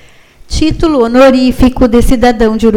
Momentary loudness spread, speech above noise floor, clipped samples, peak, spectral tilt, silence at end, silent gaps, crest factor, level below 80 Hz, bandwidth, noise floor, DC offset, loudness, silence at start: 7 LU; 30 dB; 1%; 0 dBFS; -6 dB/octave; 0 s; none; 8 dB; -18 dBFS; 16 kHz; -37 dBFS; under 0.1%; -8 LUFS; 0.5 s